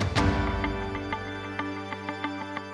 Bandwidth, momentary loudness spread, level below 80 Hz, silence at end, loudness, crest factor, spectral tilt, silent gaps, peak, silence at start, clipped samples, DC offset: 11 kHz; 9 LU; -38 dBFS; 0 s; -31 LUFS; 18 dB; -6 dB/octave; none; -10 dBFS; 0 s; under 0.1%; under 0.1%